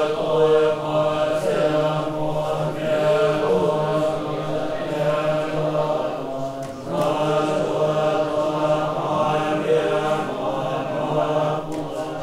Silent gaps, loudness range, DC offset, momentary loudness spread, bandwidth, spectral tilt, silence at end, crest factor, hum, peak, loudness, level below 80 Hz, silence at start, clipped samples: none; 2 LU; under 0.1%; 6 LU; 14 kHz; -6.5 dB/octave; 0 s; 16 dB; none; -6 dBFS; -22 LUFS; -50 dBFS; 0 s; under 0.1%